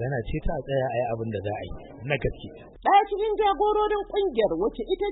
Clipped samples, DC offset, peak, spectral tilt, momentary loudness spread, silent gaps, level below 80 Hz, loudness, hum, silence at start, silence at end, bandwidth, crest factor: under 0.1%; under 0.1%; -10 dBFS; -10.5 dB/octave; 13 LU; none; -40 dBFS; -26 LUFS; none; 0 s; 0 s; 4.1 kHz; 16 dB